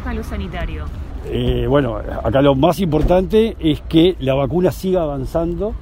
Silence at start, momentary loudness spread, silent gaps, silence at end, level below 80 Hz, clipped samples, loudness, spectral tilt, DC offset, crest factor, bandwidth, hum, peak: 0 s; 12 LU; none; 0 s; -28 dBFS; under 0.1%; -17 LUFS; -7.5 dB/octave; under 0.1%; 16 dB; 16 kHz; none; 0 dBFS